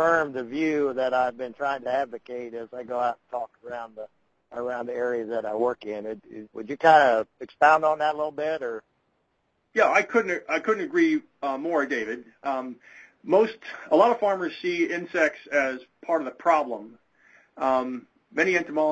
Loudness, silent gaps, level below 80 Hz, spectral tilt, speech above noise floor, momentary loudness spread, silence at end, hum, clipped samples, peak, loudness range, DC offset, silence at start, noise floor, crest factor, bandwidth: -25 LUFS; none; -68 dBFS; -5 dB/octave; 48 dB; 17 LU; 0 s; none; under 0.1%; -4 dBFS; 8 LU; under 0.1%; 0 s; -73 dBFS; 22 dB; 8.2 kHz